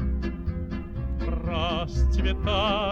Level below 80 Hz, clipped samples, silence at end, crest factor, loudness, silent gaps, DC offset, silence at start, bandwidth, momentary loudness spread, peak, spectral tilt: -28 dBFS; under 0.1%; 0 s; 14 dB; -28 LUFS; none; under 0.1%; 0 s; 7 kHz; 9 LU; -12 dBFS; -6.5 dB/octave